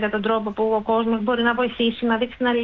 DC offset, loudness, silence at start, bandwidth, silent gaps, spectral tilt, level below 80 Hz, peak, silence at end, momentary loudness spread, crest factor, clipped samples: under 0.1%; -21 LUFS; 0 s; 4.4 kHz; none; -8 dB/octave; -52 dBFS; -8 dBFS; 0 s; 2 LU; 14 dB; under 0.1%